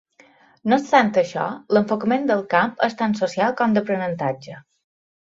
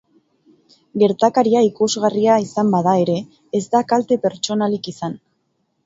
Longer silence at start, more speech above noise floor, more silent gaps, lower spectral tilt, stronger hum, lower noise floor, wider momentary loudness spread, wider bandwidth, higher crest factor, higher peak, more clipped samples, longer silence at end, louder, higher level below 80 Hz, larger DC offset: second, 0.65 s vs 0.95 s; second, 33 dB vs 51 dB; neither; about the same, -6 dB/octave vs -5.5 dB/octave; neither; second, -54 dBFS vs -68 dBFS; about the same, 10 LU vs 11 LU; about the same, 7.8 kHz vs 8 kHz; about the same, 20 dB vs 18 dB; about the same, -2 dBFS vs 0 dBFS; neither; about the same, 0.7 s vs 0.7 s; about the same, -20 LUFS vs -18 LUFS; about the same, -64 dBFS vs -64 dBFS; neither